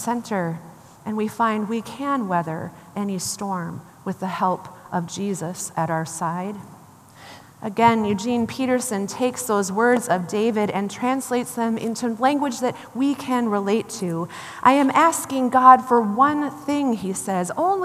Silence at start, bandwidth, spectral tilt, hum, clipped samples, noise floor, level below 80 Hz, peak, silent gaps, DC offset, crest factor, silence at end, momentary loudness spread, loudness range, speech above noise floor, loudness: 0 s; 15 kHz; -5 dB/octave; none; under 0.1%; -46 dBFS; -66 dBFS; 0 dBFS; none; under 0.1%; 22 dB; 0 s; 12 LU; 9 LU; 25 dB; -22 LUFS